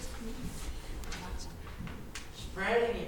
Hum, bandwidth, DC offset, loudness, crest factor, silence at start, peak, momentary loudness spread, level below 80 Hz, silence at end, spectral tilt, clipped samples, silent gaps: none; 19 kHz; under 0.1%; -38 LUFS; 18 dB; 0 s; -18 dBFS; 14 LU; -44 dBFS; 0 s; -4.5 dB/octave; under 0.1%; none